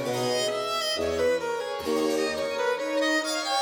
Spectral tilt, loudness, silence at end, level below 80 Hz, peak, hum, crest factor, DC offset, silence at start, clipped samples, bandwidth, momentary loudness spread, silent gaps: -3 dB/octave; -26 LUFS; 0 s; -58 dBFS; -14 dBFS; none; 12 dB; under 0.1%; 0 s; under 0.1%; over 20 kHz; 3 LU; none